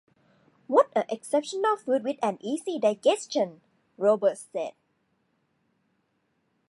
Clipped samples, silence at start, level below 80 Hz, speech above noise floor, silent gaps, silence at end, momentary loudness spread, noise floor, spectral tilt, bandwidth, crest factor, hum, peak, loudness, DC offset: under 0.1%; 0.7 s; -86 dBFS; 48 dB; none; 2 s; 9 LU; -73 dBFS; -4 dB/octave; 11.5 kHz; 20 dB; none; -8 dBFS; -27 LUFS; under 0.1%